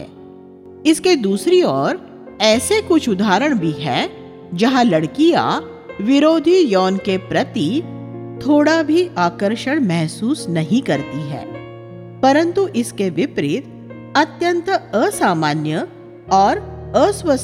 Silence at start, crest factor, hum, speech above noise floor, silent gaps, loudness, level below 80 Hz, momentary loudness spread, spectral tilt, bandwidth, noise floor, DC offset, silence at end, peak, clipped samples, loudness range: 0 s; 16 dB; none; 23 dB; none; -17 LUFS; -50 dBFS; 15 LU; -5 dB/octave; 15.5 kHz; -39 dBFS; under 0.1%; 0 s; 0 dBFS; under 0.1%; 3 LU